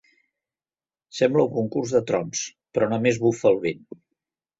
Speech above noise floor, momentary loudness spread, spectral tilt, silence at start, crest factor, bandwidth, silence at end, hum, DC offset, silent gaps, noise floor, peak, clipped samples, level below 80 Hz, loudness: over 68 dB; 9 LU; -5 dB/octave; 1.15 s; 20 dB; 8 kHz; 0.85 s; none; under 0.1%; none; under -90 dBFS; -4 dBFS; under 0.1%; -62 dBFS; -23 LUFS